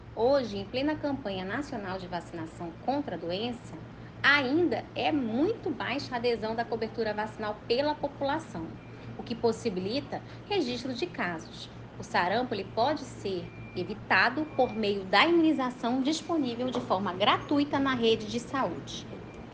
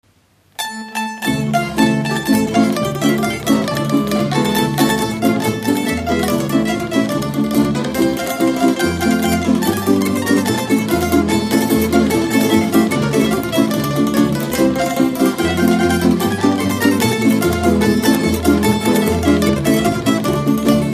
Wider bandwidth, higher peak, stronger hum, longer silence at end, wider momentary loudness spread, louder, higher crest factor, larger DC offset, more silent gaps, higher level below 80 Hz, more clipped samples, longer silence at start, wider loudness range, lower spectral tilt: second, 9.4 kHz vs 15.5 kHz; second, -6 dBFS vs 0 dBFS; neither; about the same, 0 s vs 0 s; first, 15 LU vs 4 LU; second, -29 LUFS vs -16 LUFS; first, 24 dB vs 16 dB; neither; neither; second, -56 dBFS vs -38 dBFS; neither; second, 0 s vs 0.6 s; first, 6 LU vs 2 LU; about the same, -5 dB/octave vs -5 dB/octave